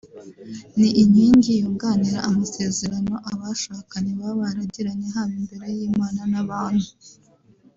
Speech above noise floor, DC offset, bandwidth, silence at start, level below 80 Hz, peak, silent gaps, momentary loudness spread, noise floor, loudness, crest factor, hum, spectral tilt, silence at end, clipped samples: 34 dB; under 0.1%; 7.8 kHz; 0.05 s; -54 dBFS; -4 dBFS; none; 14 LU; -55 dBFS; -21 LUFS; 16 dB; none; -5.5 dB/octave; 0.7 s; under 0.1%